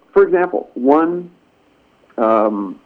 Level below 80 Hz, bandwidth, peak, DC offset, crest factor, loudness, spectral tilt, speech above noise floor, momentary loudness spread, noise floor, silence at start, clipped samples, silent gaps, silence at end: -56 dBFS; 4.4 kHz; 0 dBFS; under 0.1%; 16 dB; -16 LUFS; -9 dB/octave; 40 dB; 8 LU; -55 dBFS; 0.15 s; under 0.1%; none; 0.1 s